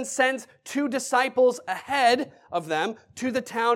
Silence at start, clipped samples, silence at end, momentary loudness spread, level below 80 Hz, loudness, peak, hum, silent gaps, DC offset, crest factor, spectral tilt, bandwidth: 0 s; under 0.1%; 0 s; 11 LU; -74 dBFS; -25 LUFS; -8 dBFS; none; none; under 0.1%; 18 dB; -2.5 dB/octave; 16 kHz